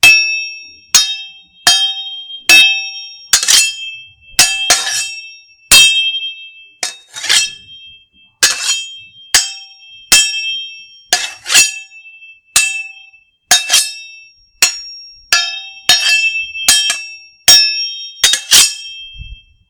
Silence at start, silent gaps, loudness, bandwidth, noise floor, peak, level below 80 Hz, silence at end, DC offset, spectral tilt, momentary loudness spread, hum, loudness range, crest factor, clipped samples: 0.05 s; none; -10 LUFS; over 20 kHz; -46 dBFS; 0 dBFS; -46 dBFS; 0.35 s; under 0.1%; 2.5 dB/octave; 21 LU; none; 5 LU; 14 dB; 0.6%